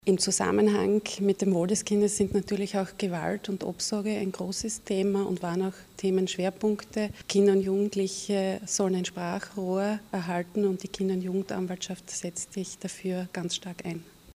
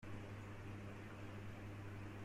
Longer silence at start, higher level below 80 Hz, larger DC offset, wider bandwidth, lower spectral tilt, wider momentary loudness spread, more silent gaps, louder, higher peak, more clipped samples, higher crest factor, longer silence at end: about the same, 0.05 s vs 0 s; about the same, -60 dBFS vs -64 dBFS; neither; about the same, 15.5 kHz vs 14.5 kHz; second, -4.5 dB/octave vs -6.5 dB/octave; first, 10 LU vs 1 LU; neither; first, -29 LUFS vs -53 LUFS; first, -12 dBFS vs -38 dBFS; neither; first, 18 dB vs 12 dB; about the same, 0 s vs 0 s